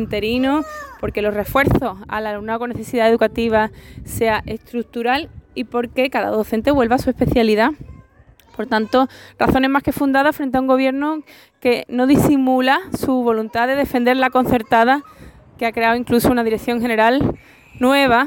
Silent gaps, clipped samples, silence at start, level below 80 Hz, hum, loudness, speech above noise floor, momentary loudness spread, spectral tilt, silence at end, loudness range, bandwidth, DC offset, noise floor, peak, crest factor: none; under 0.1%; 0 s; -40 dBFS; none; -18 LUFS; 32 dB; 9 LU; -5.5 dB/octave; 0 s; 3 LU; 17 kHz; under 0.1%; -49 dBFS; -4 dBFS; 14 dB